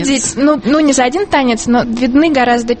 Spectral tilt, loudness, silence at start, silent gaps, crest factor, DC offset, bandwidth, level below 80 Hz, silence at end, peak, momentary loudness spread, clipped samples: -3.5 dB/octave; -12 LUFS; 0 s; none; 12 dB; under 0.1%; 8.8 kHz; -38 dBFS; 0 s; 0 dBFS; 3 LU; under 0.1%